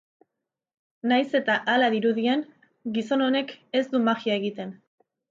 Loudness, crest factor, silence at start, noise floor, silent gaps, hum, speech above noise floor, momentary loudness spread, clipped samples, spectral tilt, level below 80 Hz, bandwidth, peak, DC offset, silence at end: -25 LUFS; 16 dB; 1.05 s; -84 dBFS; none; none; 60 dB; 11 LU; under 0.1%; -5.5 dB/octave; -78 dBFS; 7.6 kHz; -10 dBFS; under 0.1%; 0.55 s